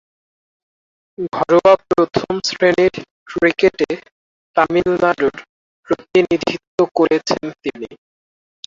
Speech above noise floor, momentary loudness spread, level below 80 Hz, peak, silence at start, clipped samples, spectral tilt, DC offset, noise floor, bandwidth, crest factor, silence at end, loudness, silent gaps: over 74 dB; 14 LU; -52 dBFS; -2 dBFS; 1.2 s; under 0.1%; -5 dB/octave; under 0.1%; under -90 dBFS; 7.6 kHz; 16 dB; 0.75 s; -17 LUFS; 3.11-3.26 s, 4.12-4.54 s, 5.49-5.83 s, 6.67-6.78 s